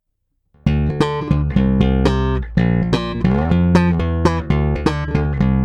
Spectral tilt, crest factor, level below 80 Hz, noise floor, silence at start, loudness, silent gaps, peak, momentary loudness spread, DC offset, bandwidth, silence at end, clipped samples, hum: -8 dB/octave; 16 dB; -24 dBFS; -69 dBFS; 0.65 s; -17 LUFS; none; 0 dBFS; 5 LU; under 0.1%; 9.8 kHz; 0 s; under 0.1%; none